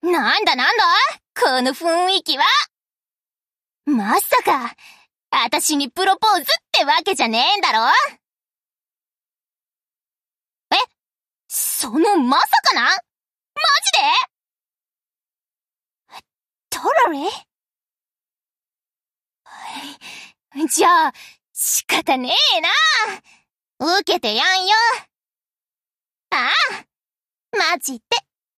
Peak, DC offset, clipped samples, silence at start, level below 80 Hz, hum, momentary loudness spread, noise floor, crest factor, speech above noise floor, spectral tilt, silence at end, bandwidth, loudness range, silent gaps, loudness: -4 dBFS; under 0.1%; under 0.1%; 0.05 s; -70 dBFS; none; 14 LU; under -90 dBFS; 16 dB; over 72 dB; -0.5 dB/octave; 0.4 s; 15 kHz; 8 LU; none; -17 LUFS